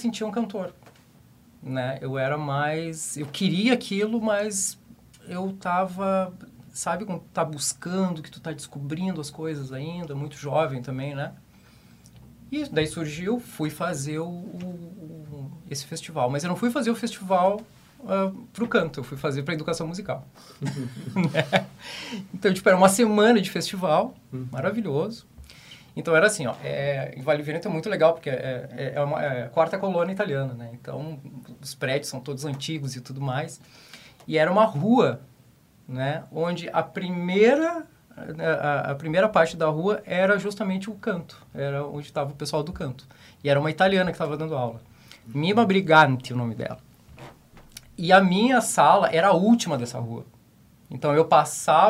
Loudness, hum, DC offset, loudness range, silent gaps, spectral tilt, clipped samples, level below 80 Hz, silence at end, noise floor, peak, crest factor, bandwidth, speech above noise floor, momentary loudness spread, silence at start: -25 LUFS; none; under 0.1%; 9 LU; none; -5 dB/octave; under 0.1%; -60 dBFS; 0 s; -56 dBFS; -4 dBFS; 22 dB; 16 kHz; 32 dB; 17 LU; 0 s